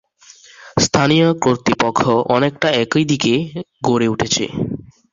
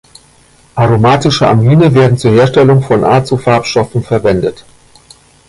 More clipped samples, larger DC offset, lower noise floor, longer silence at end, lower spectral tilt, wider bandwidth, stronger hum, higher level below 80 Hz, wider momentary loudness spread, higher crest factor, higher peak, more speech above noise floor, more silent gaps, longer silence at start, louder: neither; neither; about the same, -46 dBFS vs -45 dBFS; second, 0.3 s vs 0.9 s; second, -4.5 dB/octave vs -7 dB/octave; second, 7.8 kHz vs 11.5 kHz; neither; second, -46 dBFS vs -38 dBFS; first, 10 LU vs 7 LU; first, 16 dB vs 10 dB; about the same, 0 dBFS vs 0 dBFS; second, 30 dB vs 36 dB; neither; second, 0.6 s vs 0.75 s; second, -16 LUFS vs -9 LUFS